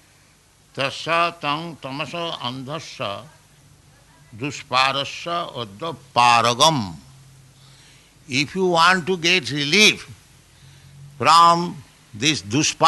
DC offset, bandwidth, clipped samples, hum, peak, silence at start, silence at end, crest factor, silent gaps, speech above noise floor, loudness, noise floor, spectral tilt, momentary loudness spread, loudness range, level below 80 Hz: under 0.1%; 12 kHz; under 0.1%; none; -2 dBFS; 0.75 s; 0 s; 18 dB; none; 35 dB; -19 LUFS; -55 dBFS; -3 dB/octave; 17 LU; 8 LU; -60 dBFS